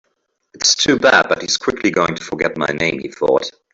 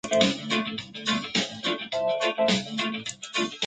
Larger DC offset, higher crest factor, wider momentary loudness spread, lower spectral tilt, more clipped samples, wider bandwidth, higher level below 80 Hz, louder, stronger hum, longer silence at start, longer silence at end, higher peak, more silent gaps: neither; about the same, 16 dB vs 20 dB; about the same, 8 LU vs 7 LU; about the same, -2.5 dB/octave vs -3.5 dB/octave; neither; second, 8 kHz vs 9.6 kHz; first, -52 dBFS vs -64 dBFS; first, -16 LUFS vs -27 LUFS; neither; first, 0.55 s vs 0.05 s; first, 0.25 s vs 0 s; first, 0 dBFS vs -6 dBFS; neither